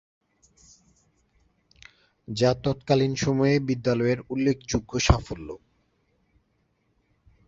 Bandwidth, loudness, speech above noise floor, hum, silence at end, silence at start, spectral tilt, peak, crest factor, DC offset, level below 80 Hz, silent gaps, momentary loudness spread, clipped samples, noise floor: 7.8 kHz; -25 LUFS; 46 dB; none; 1.9 s; 2.3 s; -5.5 dB/octave; -4 dBFS; 24 dB; under 0.1%; -40 dBFS; none; 14 LU; under 0.1%; -70 dBFS